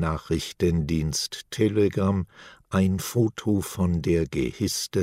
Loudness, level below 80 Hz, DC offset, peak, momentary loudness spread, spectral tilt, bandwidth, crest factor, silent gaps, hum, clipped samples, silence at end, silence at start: -25 LUFS; -42 dBFS; under 0.1%; -8 dBFS; 6 LU; -5.5 dB/octave; 16 kHz; 16 dB; none; none; under 0.1%; 0 s; 0 s